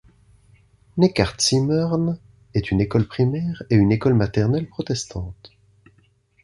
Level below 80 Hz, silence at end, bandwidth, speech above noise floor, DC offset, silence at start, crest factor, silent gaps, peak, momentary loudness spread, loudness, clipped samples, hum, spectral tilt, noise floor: -42 dBFS; 0.95 s; 11.5 kHz; 39 dB; under 0.1%; 0.95 s; 20 dB; none; -2 dBFS; 11 LU; -21 LUFS; under 0.1%; none; -6 dB/octave; -59 dBFS